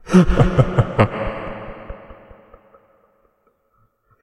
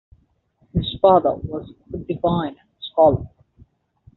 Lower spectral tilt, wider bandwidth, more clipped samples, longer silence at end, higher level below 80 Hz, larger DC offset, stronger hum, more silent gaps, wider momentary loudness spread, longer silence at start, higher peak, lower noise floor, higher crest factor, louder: first, -8 dB/octave vs -6.5 dB/octave; first, 11 kHz vs 4.2 kHz; neither; first, 2.1 s vs 0.9 s; first, -30 dBFS vs -44 dBFS; neither; neither; neither; first, 22 LU vs 19 LU; second, 0.05 s vs 0.75 s; about the same, 0 dBFS vs -2 dBFS; about the same, -63 dBFS vs -62 dBFS; about the same, 20 dB vs 20 dB; about the same, -18 LUFS vs -20 LUFS